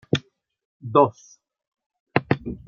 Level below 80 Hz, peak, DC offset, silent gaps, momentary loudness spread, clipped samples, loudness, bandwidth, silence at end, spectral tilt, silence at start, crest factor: -54 dBFS; -2 dBFS; under 0.1%; 0.65-0.80 s, 1.67-1.72 s, 1.86-1.90 s, 2.00-2.06 s; 8 LU; under 0.1%; -23 LUFS; 7.2 kHz; 0.1 s; -6.5 dB/octave; 0.15 s; 24 dB